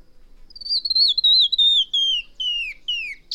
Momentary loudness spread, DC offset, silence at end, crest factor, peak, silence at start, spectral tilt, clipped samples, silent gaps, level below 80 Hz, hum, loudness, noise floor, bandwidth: 12 LU; under 0.1%; 0 s; 12 dB; -8 dBFS; 0.15 s; 3 dB/octave; under 0.1%; none; -50 dBFS; none; -17 LUFS; -44 dBFS; 13.5 kHz